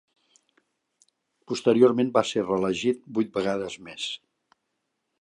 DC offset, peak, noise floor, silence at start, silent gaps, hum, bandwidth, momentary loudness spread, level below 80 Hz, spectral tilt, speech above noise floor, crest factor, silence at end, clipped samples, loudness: under 0.1%; -6 dBFS; -79 dBFS; 1.5 s; none; none; 10.5 kHz; 14 LU; -66 dBFS; -5 dB/octave; 55 dB; 22 dB; 1.05 s; under 0.1%; -25 LUFS